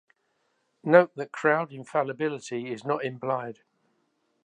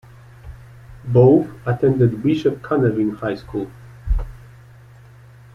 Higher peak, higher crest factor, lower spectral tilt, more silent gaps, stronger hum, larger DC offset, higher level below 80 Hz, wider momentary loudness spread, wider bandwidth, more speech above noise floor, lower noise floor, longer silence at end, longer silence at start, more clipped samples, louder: about the same, -2 dBFS vs -2 dBFS; first, 26 dB vs 18 dB; second, -6.5 dB/octave vs -9.5 dB/octave; neither; neither; neither; second, -82 dBFS vs -34 dBFS; second, 13 LU vs 17 LU; first, 9.8 kHz vs 6.8 kHz; first, 47 dB vs 27 dB; first, -73 dBFS vs -44 dBFS; second, 0.95 s vs 1.2 s; first, 0.85 s vs 0.45 s; neither; second, -26 LUFS vs -19 LUFS